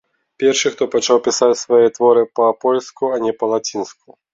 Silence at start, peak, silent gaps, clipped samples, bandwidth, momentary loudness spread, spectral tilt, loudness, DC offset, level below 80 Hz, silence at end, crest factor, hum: 0.4 s; -2 dBFS; none; under 0.1%; 7.8 kHz; 7 LU; -3 dB/octave; -16 LUFS; under 0.1%; -64 dBFS; 0.4 s; 14 dB; none